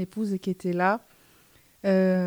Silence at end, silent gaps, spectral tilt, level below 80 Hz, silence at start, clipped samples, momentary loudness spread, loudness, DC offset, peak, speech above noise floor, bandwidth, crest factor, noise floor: 0 s; none; -8 dB/octave; -70 dBFS; 0 s; under 0.1%; 8 LU; -27 LUFS; under 0.1%; -10 dBFS; 34 dB; 18.5 kHz; 16 dB; -59 dBFS